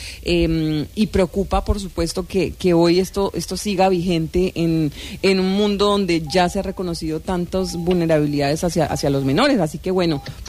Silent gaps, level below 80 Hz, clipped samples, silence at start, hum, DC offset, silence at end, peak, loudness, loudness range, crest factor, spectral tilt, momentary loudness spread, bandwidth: none; -34 dBFS; under 0.1%; 0 s; none; under 0.1%; 0 s; -6 dBFS; -19 LUFS; 1 LU; 14 dB; -6 dB/octave; 7 LU; 15.5 kHz